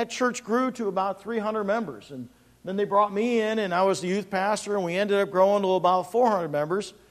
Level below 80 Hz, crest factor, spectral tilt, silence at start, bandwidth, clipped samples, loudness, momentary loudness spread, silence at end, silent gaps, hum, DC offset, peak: -68 dBFS; 16 dB; -5 dB/octave; 0 s; 14.5 kHz; under 0.1%; -25 LUFS; 10 LU; 0.2 s; none; none; under 0.1%; -10 dBFS